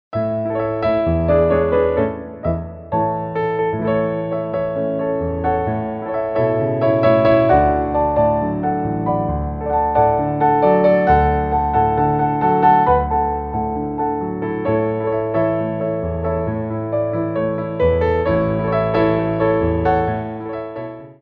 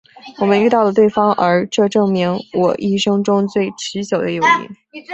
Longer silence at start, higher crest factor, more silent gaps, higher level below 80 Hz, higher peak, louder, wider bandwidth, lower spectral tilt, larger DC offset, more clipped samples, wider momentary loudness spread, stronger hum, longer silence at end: second, 0.1 s vs 0.25 s; about the same, 16 dB vs 14 dB; neither; first, -34 dBFS vs -58 dBFS; about the same, -2 dBFS vs -2 dBFS; second, -18 LUFS vs -15 LUFS; second, 5.2 kHz vs 8.2 kHz; first, -10.5 dB/octave vs -5.5 dB/octave; neither; neither; about the same, 9 LU vs 7 LU; neither; about the same, 0.1 s vs 0 s